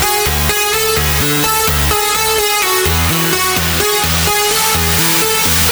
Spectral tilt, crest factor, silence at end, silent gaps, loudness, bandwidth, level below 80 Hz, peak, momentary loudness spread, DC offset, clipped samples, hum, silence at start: -2.5 dB/octave; 14 dB; 0 s; none; -11 LUFS; over 20 kHz; -26 dBFS; 0 dBFS; 2 LU; under 0.1%; under 0.1%; none; 0 s